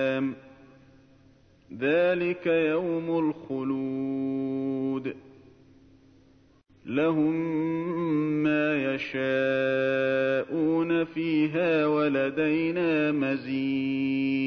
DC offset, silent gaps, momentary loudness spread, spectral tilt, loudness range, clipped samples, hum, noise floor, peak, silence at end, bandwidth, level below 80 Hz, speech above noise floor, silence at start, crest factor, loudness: under 0.1%; none; 6 LU; -8 dB/octave; 6 LU; under 0.1%; none; -59 dBFS; -14 dBFS; 0 s; 6.4 kHz; -68 dBFS; 33 dB; 0 s; 14 dB; -27 LUFS